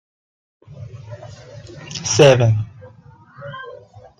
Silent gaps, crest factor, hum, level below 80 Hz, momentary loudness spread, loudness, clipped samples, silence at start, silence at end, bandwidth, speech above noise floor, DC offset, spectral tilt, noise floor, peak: none; 20 dB; none; -52 dBFS; 27 LU; -15 LUFS; under 0.1%; 0.7 s; 0.45 s; 10 kHz; 30 dB; under 0.1%; -5 dB/octave; -46 dBFS; 0 dBFS